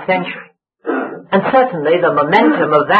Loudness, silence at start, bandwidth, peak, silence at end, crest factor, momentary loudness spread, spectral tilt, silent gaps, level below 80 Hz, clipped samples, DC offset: -14 LUFS; 0 s; 6 kHz; 0 dBFS; 0 s; 14 dB; 13 LU; -8 dB/octave; none; -60 dBFS; under 0.1%; under 0.1%